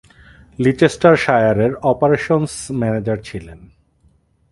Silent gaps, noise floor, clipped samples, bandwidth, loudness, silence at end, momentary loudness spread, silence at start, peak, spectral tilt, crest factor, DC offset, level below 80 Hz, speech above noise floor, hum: none; -57 dBFS; under 0.1%; 11.5 kHz; -16 LUFS; 0.95 s; 11 LU; 0.6 s; 0 dBFS; -6.5 dB/octave; 18 dB; under 0.1%; -46 dBFS; 41 dB; none